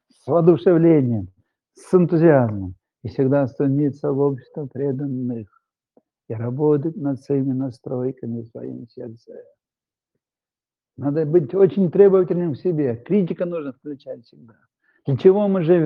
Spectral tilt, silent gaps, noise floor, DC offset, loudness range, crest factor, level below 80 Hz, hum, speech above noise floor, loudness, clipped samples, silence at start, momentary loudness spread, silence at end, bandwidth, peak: -10.5 dB/octave; none; under -90 dBFS; under 0.1%; 9 LU; 18 dB; -66 dBFS; none; over 71 dB; -19 LUFS; under 0.1%; 0.25 s; 19 LU; 0 s; 9.4 kHz; -2 dBFS